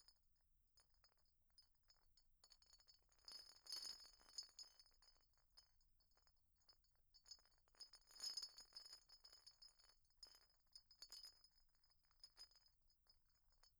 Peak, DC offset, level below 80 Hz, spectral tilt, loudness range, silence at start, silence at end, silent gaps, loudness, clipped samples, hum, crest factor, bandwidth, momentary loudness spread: -40 dBFS; under 0.1%; -84 dBFS; 1.5 dB/octave; 9 LU; 0 s; 0 s; none; -59 LUFS; under 0.1%; none; 26 dB; over 20 kHz; 15 LU